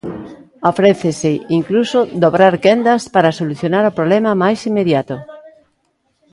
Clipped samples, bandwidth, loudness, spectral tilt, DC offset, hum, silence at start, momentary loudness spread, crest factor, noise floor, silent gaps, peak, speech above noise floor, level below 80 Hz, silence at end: under 0.1%; 11.5 kHz; -14 LUFS; -6 dB/octave; under 0.1%; none; 0.05 s; 8 LU; 14 dB; -64 dBFS; none; 0 dBFS; 51 dB; -56 dBFS; 0.85 s